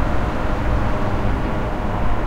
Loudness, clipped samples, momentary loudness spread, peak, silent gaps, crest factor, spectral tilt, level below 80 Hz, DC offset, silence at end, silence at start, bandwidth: -23 LUFS; under 0.1%; 2 LU; -6 dBFS; none; 12 dB; -7.5 dB/octave; -24 dBFS; under 0.1%; 0 s; 0 s; 8.4 kHz